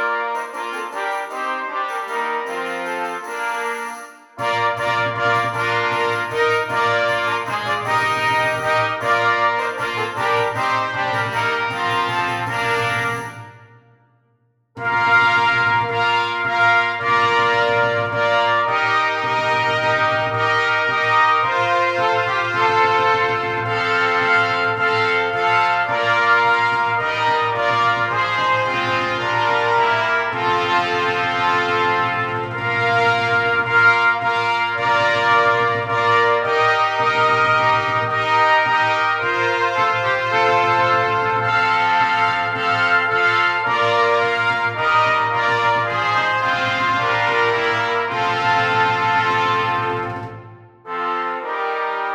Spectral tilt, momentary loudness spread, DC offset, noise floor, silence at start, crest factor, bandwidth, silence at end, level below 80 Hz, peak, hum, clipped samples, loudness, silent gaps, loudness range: -4 dB/octave; 8 LU; under 0.1%; -63 dBFS; 0 s; 16 dB; 17.5 kHz; 0 s; -58 dBFS; -2 dBFS; none; under 0.1%; -17 LUFS; none; 5 LU